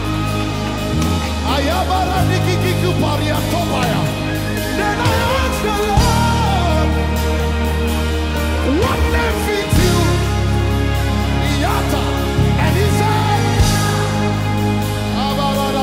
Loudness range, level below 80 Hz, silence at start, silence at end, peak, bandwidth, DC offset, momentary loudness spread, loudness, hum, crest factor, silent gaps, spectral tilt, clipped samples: 1 LU; -22 dBFS; 0 s; 0 s; -4 dBFS; 16 kHz; under 0.1%; 4 LU; -17 LUFS; none; 12 dB; none; -5.5 dB/octave; under 0.1%